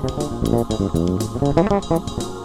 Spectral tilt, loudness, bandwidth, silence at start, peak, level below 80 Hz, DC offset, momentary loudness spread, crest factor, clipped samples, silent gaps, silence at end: -7 dB/octave; -21 LUFS; 17 kHz; 0 s; -4 dBFS; -32 dBFS; under 0.1%; 5 LU; 16 dB; under 0.1%; none; 0 s